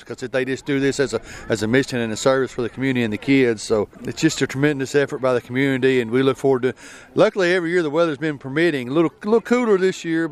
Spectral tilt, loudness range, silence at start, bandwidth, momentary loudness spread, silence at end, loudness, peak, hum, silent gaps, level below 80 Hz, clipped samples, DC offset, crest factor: -5.5 dB/octave; 1 LU; 0 s; 13.5 kHz; 6 LU; 0 s; -20 LUFS; -2 dBFS; none; none; -52 dBFS; under 0.1%; under 0.1%; 18 dB